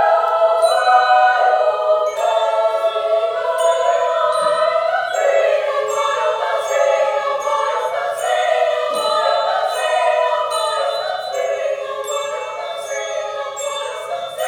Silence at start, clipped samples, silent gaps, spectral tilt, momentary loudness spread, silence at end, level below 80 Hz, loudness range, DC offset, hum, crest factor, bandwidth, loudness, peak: 0 s; under 0.1%; none; 0 dB/octave; 9 LU; 0 s; -68 dBFS; 6 LU; under 0.1%; none; 16 dB; 17.5 kHz; -17 LUFS; -2 dBFS